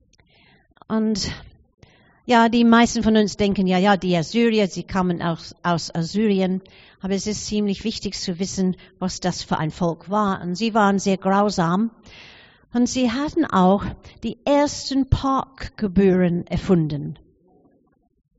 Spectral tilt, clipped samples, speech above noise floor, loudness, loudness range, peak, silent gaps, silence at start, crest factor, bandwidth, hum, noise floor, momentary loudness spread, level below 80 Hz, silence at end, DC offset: -5 dB/octave; under 0.1%; 39 dB; -21 LUFS; 6 LU; -2 dBFS; 1.74-1.78 s; 0.9 s; 20 dB; 8 kHz; none; -59 dBFS; 10 LU; -42 dBFS; 1.25 s; under 0.1%